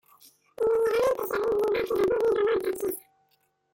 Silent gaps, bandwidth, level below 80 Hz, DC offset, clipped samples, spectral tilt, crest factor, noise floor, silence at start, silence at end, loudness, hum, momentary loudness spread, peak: none; 17 kHz; -60 dBFS; under 0.1%; under 0.1%; -4.5 dB/octave; 12 dB; -71 dBFS; 0.6 s; 0.75 s; -26 LUFS; none; 7 LU; -14 dBFS